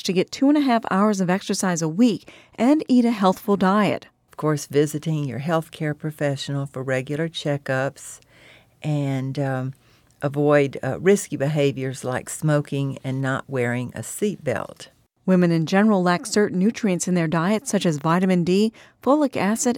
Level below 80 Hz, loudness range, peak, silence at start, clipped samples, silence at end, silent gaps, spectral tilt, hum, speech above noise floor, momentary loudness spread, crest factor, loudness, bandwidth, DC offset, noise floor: -62 dBFS; 6 LU; -6 dBFS; 0.05 s; under 0.1%; 0 s; none; -6 dB/octave; none; 30 dB; 9 LU; 16 dB; -22 LUFS; 17.5 kHz; under 0.1%; -51 dBFS